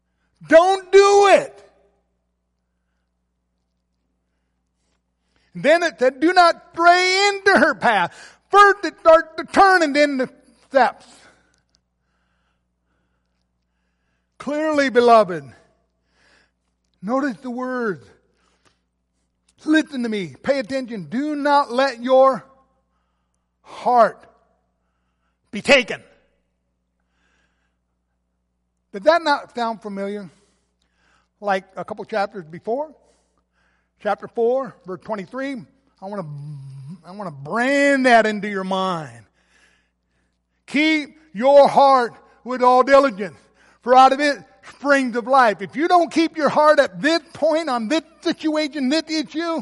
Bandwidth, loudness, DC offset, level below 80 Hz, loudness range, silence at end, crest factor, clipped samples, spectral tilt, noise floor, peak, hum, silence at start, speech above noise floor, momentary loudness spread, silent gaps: 11.5 kHz; -17 LUFS; under 0.1%; -60 dBFS; 12 LU; 0 s; 18 dB; under 0.1%; -4 dB/octave; -72 dBFS; -2 dBFS; 60 Hz at -60 dBFS; 0.4 s; 54 dB; 19 LU; none